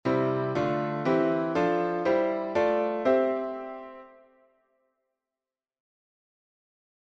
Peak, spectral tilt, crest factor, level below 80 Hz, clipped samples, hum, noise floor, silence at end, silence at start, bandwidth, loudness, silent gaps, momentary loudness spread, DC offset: -12 dBFS; -7.5 dB/octave; 18 dB; -66 dBFS; under 0.1%; none; under -90 dBFS; 2.95 s; 0.05 s; 7.6 kHz; -27 LUFS; none; 11 LU; under 0.1%